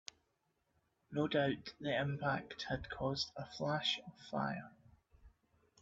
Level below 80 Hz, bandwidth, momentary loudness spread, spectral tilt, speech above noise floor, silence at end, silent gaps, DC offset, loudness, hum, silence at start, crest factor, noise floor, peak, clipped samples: -66 dBFS; 7.8 kHz; 9 LU; -3.5 dB/octave; 43 dB; 0.55 s; none; under 0.1%; -39 LUFS; none; 1.1 s; 20 dB; -82 dBFS; -22 dBFS; under 0.1%